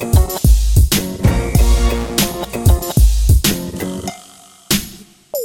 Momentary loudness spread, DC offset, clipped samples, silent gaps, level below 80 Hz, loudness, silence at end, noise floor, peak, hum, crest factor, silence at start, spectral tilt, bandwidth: 11 LU; under 0.1%; under 0.1%; none; -16 dBFS; -15 LUFS; 0 s; -42 dBFS; 0 dBFS; none; 14 dB; 0 s; -5 dB/octave; 17 kHz